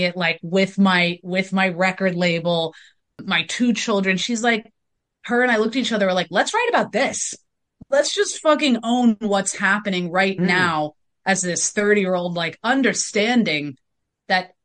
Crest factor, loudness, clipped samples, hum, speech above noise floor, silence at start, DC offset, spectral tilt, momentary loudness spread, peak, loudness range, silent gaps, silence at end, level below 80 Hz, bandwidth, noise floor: 16 dB; -20 LUFS; under 0.1%; none; 50 dB; 0 s; under 0.1%; -4 dB/octave; 6 LU; -4 dBFS; 2 LU; none; 0.2 s; -66 dBFS; 10 kHz; -70 dBFS